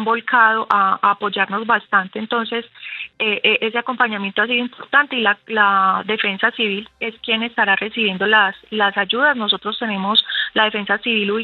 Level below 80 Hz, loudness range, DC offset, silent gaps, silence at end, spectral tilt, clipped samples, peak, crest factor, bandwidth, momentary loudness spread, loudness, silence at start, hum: -66 dBFS; 2 LU; under 0.1%; none; 0 s; -6 dB/octave; under 0.1%; 0 dBFS; 18 dB; 5.2 kHz; 8 LU; -17 LUFS; 0 s; none